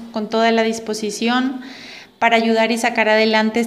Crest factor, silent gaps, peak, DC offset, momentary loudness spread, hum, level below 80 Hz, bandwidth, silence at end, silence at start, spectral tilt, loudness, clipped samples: 16 dB; none; -2 dBFS; under 0.1%; 15 LU; none; -64 dBFS; 15 kHz; 0 s; 0 s; -3.5 dB/octave; -17 LUFS; under 0.1%